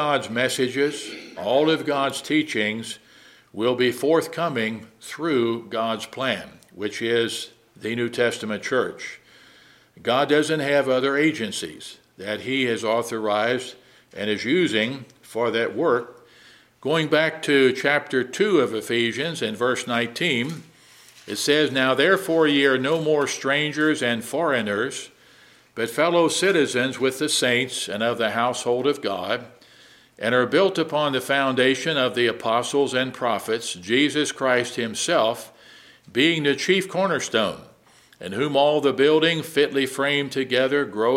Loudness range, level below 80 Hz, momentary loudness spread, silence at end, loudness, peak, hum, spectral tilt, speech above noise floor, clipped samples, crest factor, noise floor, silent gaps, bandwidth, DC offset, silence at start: 4 LU; -70 dBFS; 12 LU; 0 s; -22 LUFS; -4 dBFS; none; -4 dB/octave; 32 dB; under 0.1%; 20 dB; -54 dBFS; none; 16 kHz; under 0.1%; 0 s